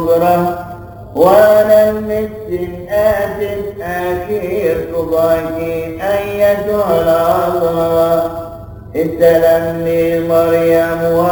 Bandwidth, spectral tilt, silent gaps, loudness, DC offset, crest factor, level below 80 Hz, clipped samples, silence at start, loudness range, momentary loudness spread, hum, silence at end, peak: over 20 kHz; -6.5 dB/octave; none; -13 LUFS; under 0.1%; 12 dB; -38 dBFS; under 0.1%; 0 s; 4 LU; 12 LU; none; 0 s; 0 dBFS